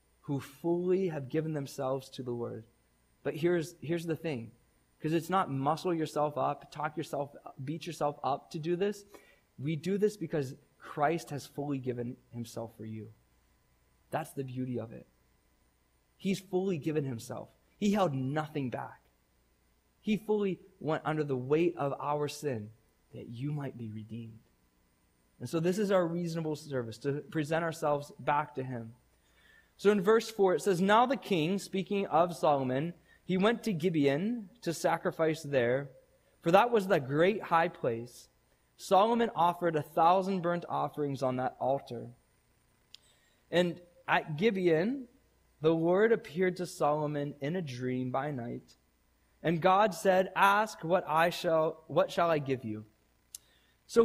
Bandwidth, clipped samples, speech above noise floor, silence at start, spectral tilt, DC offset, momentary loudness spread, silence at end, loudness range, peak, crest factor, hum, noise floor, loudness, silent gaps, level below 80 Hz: 15.5 kHz; under 0.1%; 40 dB; 0.3 s; -6 dB/octave; under 0.1%; 15 LU; 0 s; 8 LU; -10 dBFS; 22 dB; none; -71 dBFS; -32 LUFS; none; -70 dBFS